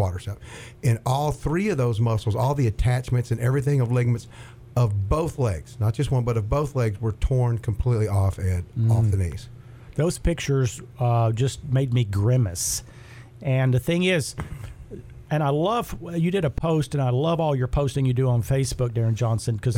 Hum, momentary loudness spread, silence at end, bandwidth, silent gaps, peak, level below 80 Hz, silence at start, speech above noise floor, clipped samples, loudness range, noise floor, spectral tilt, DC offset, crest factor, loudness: none; 10 LU; 0 s; 15.5 kHz; none; -10 dBFS; -38 dBFS; 0 s; 21 dB; under 0.1%; 2 LU; -44 dBFS; -6.5 dB/octave; under 0.1%; 14 dB; -24 LUFS